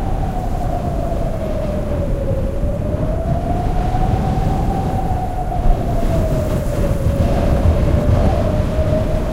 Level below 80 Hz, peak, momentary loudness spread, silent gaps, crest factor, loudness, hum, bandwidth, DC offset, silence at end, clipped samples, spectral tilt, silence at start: -20 dBFS; -2 dBFS; 6 LU; none; 14 dB; -19 LUFS; none; 15.5 kHz; under 0.1%; 0 s; under 0.1%; -8 dB/octave; 0 s